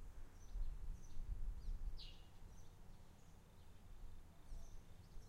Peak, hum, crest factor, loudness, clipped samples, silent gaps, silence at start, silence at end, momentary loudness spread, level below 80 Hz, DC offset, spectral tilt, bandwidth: -34 dBFS; none; 16 dB; -58 LUFS; under 0.1%; none; 0 s; 0 s; 13 LU; -50 dBFS; under 0.1%; -5 dB/octave; 12.5 kHz